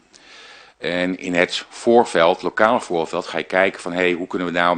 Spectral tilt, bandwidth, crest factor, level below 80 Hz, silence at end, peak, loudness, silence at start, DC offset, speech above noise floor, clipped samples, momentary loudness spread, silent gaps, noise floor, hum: -4.5 dB/octave; 10 kHz; 20 dB; -58 dBFS; 0 s; 0 dBFS; -19 LUFS; 0.35 s; under 0.1%; 26 dB; under 0.1%; 8 LU; none; -45 dBFS; none